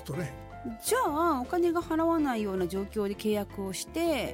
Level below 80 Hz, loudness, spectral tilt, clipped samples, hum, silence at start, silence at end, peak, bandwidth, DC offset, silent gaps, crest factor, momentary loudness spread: -50 dBFS; -30 LUFS; -5 dB/octave; under 0.1%; none; 0 s; 0 s; -16 dBFS; 17 kHz; under 0.1%; none; 12 dB; 9 LU